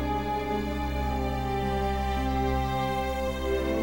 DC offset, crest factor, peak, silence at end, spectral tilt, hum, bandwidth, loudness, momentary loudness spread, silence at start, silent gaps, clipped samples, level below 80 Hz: under 0.1%; 12 dB; -16 dBFS; 0 s; -6.5 dB/octave; none; 18 kHz; -29 LUFS; 2 LU; 0 s; none; under 0.1%; -34 dBFS